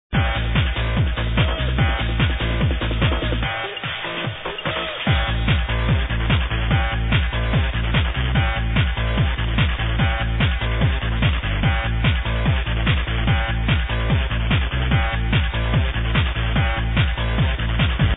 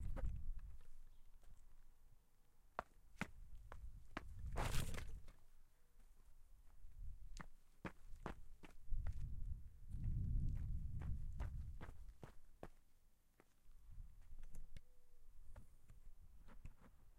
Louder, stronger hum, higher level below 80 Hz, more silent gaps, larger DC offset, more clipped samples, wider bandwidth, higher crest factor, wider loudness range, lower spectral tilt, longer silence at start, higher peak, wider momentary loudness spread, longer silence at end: first, -21 LUFS vs -53 LUFS; neither; first, -24 dBFS vs -50 dBFS; neither; neither; neither; second, 4 kHz vs 15.5 kHz; second, 14 dB vs 22 dB; second, 2 LU vs 16 LU; first, -9.5 dB/octave vs -5.5 dB/octave; about the same, 0.1 s vs 0 s; first, -4 dBFS vs -26 dBFS; second, 1 LU vs 21 LU; about the same, 0 s vs 0.05 s